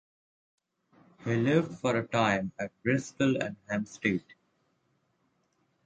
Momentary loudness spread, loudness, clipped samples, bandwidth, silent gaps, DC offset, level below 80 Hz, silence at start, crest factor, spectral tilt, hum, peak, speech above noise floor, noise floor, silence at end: 8 LU; -30 LUFS; under 0.1%; 9.2 kHz; none; under 0.1%; -66 dBFS; 1.2 s; 20 dB; -6 dB/octave; none; -12 dBFS; 45 dB; -74 dBFS; 1.5 s